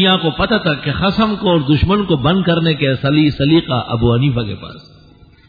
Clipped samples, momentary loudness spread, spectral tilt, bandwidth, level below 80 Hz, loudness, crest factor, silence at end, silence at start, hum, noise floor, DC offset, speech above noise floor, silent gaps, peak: under 0.1%; 5 LU; -9 dB/octave; 5 kHz; -34 dBFS; -15 LUFS; 14 dB; 0.65 s; 0 s; none; -44 dBFS; under 0.1%; 30 dB; none; -2 dBFS